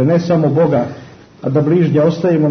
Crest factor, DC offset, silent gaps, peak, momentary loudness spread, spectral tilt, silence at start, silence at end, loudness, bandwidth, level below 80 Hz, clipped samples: 12 dB; under 0.1%; none; -2 dBFS; 12 LU; -9 dB/octave; 0 s; 0 s; -14 LUFS; 6.4 kHz; -52 dBFS; under 0.1%